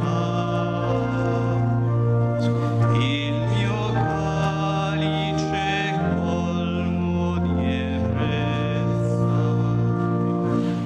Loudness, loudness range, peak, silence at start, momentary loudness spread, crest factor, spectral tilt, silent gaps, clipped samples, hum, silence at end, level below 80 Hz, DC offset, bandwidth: -23 LUFS; 1 LU; -8 dBFS; 0 s; 2 LU; 14 dB; -7.5 dB/octave; none; under 0.1%; none; 0 s; -42 dBFS; under 0.1%; 8.4 kHz